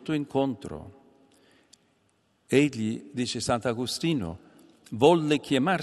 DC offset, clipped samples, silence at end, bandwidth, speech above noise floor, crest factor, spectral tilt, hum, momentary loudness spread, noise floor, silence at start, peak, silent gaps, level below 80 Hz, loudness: under 0.1%; under 0.1%; 0 s; 13 kHz; 43 dB; 22 dB; -5.5 dB/octave; none; 17 LU; -69 dBFS; 0 s; -6 dBFS; none; -62 dBFS; -26 LUFS